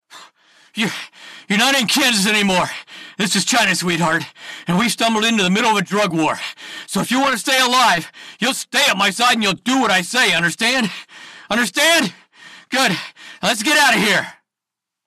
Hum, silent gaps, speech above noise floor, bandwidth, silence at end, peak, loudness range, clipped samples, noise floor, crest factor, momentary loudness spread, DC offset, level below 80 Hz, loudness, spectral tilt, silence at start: none; none; 67 dB; 14.5 kHz; 0.75 s; -4 dBFS; 2 LU; under 0.1%; -84 dBFS; 14 dB; 12 LU; under 0.1%; -58 dBFS; -16 LUFS; -2.5 dB/octave; 0.15 s